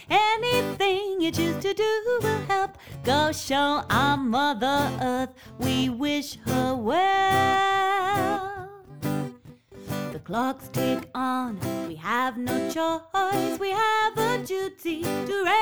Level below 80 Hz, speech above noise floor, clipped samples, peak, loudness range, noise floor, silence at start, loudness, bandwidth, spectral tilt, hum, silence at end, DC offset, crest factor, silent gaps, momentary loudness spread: -56 dBFS; 22 dB; under 0.1%; -10 dBFS; 5 LU; -47 dBFS; 0 s; -25 LUFS; over 20 kHz; -4.5 dB/octave; none; 0 s; 0.2%; 16 dB; none; 10 LU